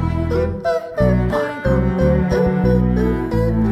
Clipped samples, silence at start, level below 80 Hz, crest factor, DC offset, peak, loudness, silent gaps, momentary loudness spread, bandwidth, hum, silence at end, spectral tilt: under 0.1%; 0 s; -26 dBFS; 14 dB; under 0.1%; -4 dBFS; -18 LUFS; none; 4 LU; 12.5 kHz; none; 0 s; -9 dB/octave